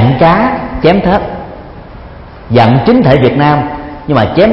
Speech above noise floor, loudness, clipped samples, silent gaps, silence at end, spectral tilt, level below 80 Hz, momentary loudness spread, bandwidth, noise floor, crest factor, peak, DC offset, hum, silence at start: 22 dB; -9 LUFS; 0.3%; none; 0 s; -9.5 dB/octave; -30 dBFS; 18 LU; 5.8 kHz; -29 dBFS; 10 dB; 0 dBFS; under 0.1%; none; 0 s